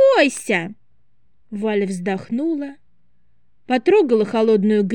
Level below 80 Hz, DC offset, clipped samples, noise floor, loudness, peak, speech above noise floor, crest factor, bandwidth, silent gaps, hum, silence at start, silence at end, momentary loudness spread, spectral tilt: -68 dBFS; 0.4%; under 0.1%; -67 dBFS; -19 LUFS; -2 dBFS; 49 dB; 18 dB; 12.5 kHz; none; none; 0 s; 0 s; 11 LU; -5.5 dB/octave